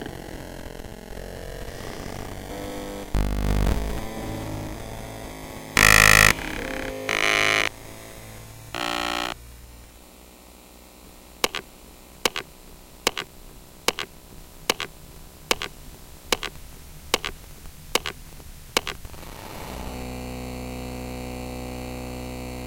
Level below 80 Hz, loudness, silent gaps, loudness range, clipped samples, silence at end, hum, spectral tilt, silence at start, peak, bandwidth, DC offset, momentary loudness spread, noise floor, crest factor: -36 dBFS; -24 LUFS; none; 14 LU; under 0.1%; 0 s; none; -2.5 dB/octave; 0 s; 0 dBFS; 17 kHz; under 0.1%; 23 LU; -48 dBFS; 28 dB